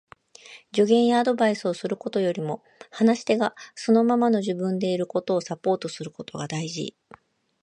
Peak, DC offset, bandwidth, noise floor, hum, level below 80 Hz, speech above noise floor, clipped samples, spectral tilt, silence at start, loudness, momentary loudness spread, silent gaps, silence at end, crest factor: -8 dBFS; under 0.1%; 9.6 kHz; -49 dBFS; none; -72 dBFS; 25 dB; under 0.1%; -5.5 dB/octave; 0.5 s; -24 LUFS; 14 LU; none; 0.7 s; 18 dB